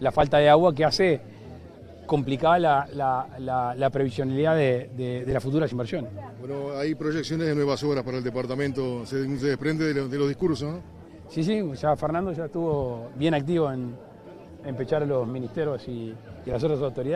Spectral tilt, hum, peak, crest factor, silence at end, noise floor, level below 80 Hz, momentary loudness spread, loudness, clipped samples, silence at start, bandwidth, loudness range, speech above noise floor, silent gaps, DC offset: -7 dB/octave; none; -4 dBFS; 20 dB; 0 s; -45 dBFS; -52 dBFS; 17 LU; -25 LUFS; under 0.1%; 0 s; 13 kHz; 4 LU; 20 dB; none; under 0.1%